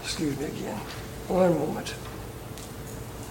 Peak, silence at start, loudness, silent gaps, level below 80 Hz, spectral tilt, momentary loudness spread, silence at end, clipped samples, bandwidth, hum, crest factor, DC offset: -10 dBFS; 0 s; -30 LUFS; none; -48 dBFS; -5.5 dB/octave; 15 LU; 0 s; under 0.1%; 17 kHz; none; 20 dB; under 0.1%